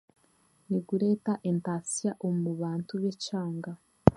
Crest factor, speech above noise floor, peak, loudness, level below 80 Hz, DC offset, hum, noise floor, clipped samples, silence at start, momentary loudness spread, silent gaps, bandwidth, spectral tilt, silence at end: 30 dB; 36 dB; 0 dBFS; -31 LUFS; -54 dBFS; under 0.1%; none; -67 dBFS; under 0.1%; 0.7 s; 6 LU; none; 11.5 kHz; -6.5 dB/octave; 0 s